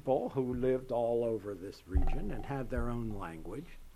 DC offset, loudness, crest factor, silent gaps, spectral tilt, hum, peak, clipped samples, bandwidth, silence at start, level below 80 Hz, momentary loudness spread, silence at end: under 0.1%; -36 LUFS; 16 dB; none; -8.5 dB/octave; none; -18 dBFS; under 0.1%; 12.5 kHz; 0.05 s; -38 dBFS; 12 LU; 0.05 s